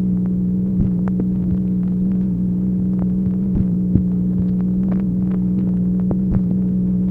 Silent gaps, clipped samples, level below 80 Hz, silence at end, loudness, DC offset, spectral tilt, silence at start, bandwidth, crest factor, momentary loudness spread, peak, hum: none; under 0.1%; -32 dBFS; 0 s; -19 LUFS; under 0.1%; -12.5 dB/octave; 0 s; 2 kHz; 18 dB; 1 LU; 0 dBFS; none